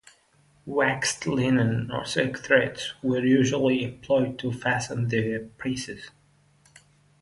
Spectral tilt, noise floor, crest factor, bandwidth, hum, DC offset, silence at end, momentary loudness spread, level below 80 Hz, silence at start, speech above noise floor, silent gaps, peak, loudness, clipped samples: -5 dB/octave; -62 dBFS; 20 dB; 11.5 kHz; 50 Hz at -60 dBFS; under 0.1%; 1.1 s; 9 LU; -58 dBFS; 0.65 s; 37 dB; none; -6 dBFS; -25 LUFS; under 0.1%